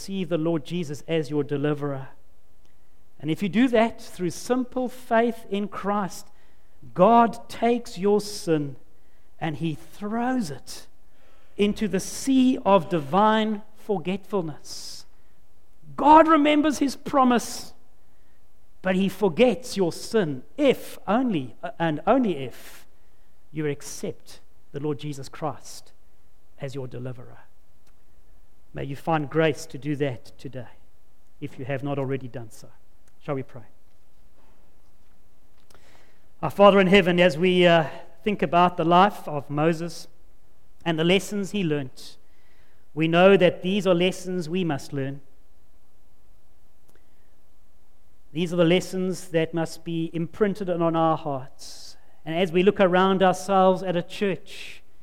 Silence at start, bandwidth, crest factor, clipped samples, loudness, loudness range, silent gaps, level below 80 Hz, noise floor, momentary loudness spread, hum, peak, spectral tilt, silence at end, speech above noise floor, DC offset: 0 s; 16.5 kHz; 24 dB; under 0.1%; -23 LUFS; 14 LU; none; -54 dBFS; -59 dBFS; 20 LU; none; 0 dBFS; -6 dB/octave; 0.3 s; 36 dB; 1%